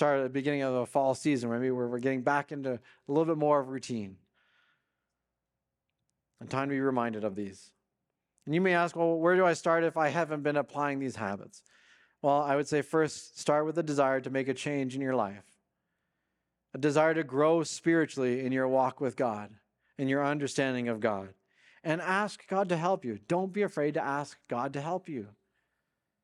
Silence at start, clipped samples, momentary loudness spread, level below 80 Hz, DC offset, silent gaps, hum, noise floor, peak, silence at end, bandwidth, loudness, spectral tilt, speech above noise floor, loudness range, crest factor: 0 s; under 0.1%; 10 LU; -80 dBFS; under 0.1%; none; none; -87 dBFS; -12 dBFS; 0.95 s; 12 kHz; -30 LUFS; -6 dB/octave; 57 dB; 6 LU; 20 dB